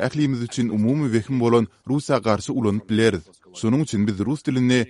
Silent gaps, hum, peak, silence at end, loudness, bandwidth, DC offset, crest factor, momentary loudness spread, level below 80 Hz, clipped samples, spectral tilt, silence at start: none; none; -4 dBFS; 0.05 s; -22 LUFS; 11.5 kHz; under 0.1%; 18 dB; 5 LU; -56 dBFS; under 0.1%; -6.5 dB/octave; 0 s